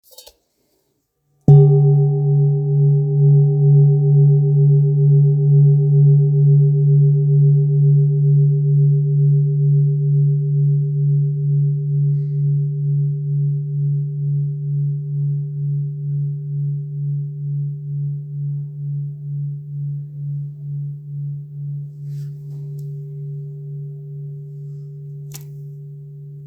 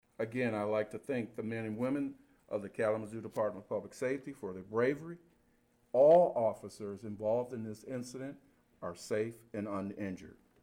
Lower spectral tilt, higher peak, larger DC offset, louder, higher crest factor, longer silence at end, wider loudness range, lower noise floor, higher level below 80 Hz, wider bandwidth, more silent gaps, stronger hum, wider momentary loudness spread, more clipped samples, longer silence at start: first, -12 dB/octave vs -7 dB/octave; first, 0 dBFS vs -16 dBFS; neither; first, -16 LUFS vs -35 LUFS; about the same, 16 dB vs 20 dB; second, 0 s vs 0.3 s; first, 16 LU vs 8 LU; about the same, -68 dBFS vs -71 dBFS; first, -58 dBFS vs -74 dBFS; second, 0.9 kHz vs 16 kHz; neither; neither; first, 18 LU vs 14 LU; neither; first, 1.5 s vs 0.2 s